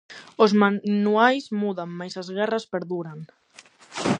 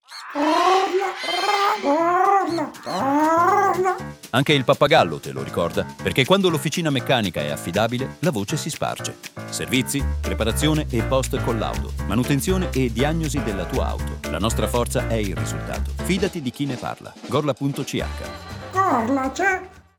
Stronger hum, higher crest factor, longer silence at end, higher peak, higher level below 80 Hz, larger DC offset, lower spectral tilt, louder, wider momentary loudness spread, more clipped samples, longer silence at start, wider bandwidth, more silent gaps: neither; about the same, 20 dB vs 18 dB; second, 0 s vs 0.2 s; about the same, -2 dBFS vs -2 dBFS; second, -68 dBFS vs -34 dBFS; neither; about the same, -6 dB/octave vs -5 dB/octave; about the same, -23 LUFS vs -22 LUFS; first, 18 LU vs 10 LU; neither; about the same, 0.1 s vs 0.1 s; second, 9.6 kHz vs 19 kHz; neither